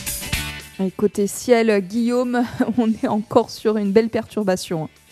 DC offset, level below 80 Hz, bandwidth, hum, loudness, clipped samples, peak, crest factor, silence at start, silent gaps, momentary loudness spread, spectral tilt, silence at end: under 0.1%; -44 dBFS; 14 kHz; none; -20 LUFS; under 0.1%; -2 dBFS; 18 dB; 0 s; none; 8 LU; -5 dB/octave; 0.25 s